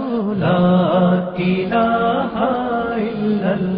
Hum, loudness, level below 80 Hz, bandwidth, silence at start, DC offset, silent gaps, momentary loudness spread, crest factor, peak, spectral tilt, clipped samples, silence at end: none; -17 LUFS; -48 dBFS; 5 kHz; 0 s; under 0.1%; none; 6 LU; 12 dB; -6 dBFS; -12 dB/octave; under 0.1%; 0 s